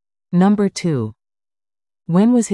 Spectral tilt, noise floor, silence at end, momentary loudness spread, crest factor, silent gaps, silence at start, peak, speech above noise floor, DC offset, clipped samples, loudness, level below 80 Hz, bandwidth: -7 dB/octave; under -90 dBFS; 0 s; 9 LU; 12 dB; none; 0.3 s; -6 dBFS; over 75 dB; under 0.1%; under 0.1%; -17 LUFS; -58 dBFS; 11.5 kHz